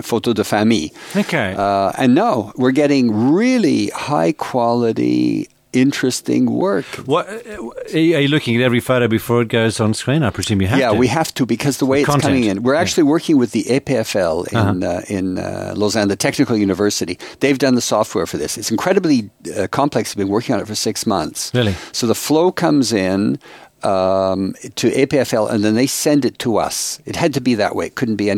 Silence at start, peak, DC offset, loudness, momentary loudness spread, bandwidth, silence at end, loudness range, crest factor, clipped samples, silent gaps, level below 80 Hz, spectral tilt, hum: 0 s; 0 dBFS; under 0.1%; -17 LUFS; 7 LU; 16.5 kHz; 0 s; 2 LU; 16 dB; under 0.1%; none; -50 dBFS; -5 dB/octave; none